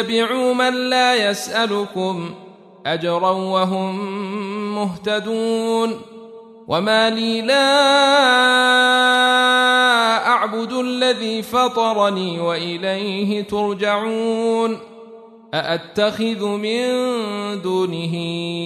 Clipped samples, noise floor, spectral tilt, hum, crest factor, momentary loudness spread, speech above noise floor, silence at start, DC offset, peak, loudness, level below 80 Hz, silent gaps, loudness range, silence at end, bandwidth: under 0.1%; -41 dBFS; -4 dB/octave; none; 16 dB; 11 LU; 23 dB; 0 s; under 0.1%; -2 dBFS; -18 LUFS; -64 dBFS; none; 8 LU; 0 s; 13.5 kHz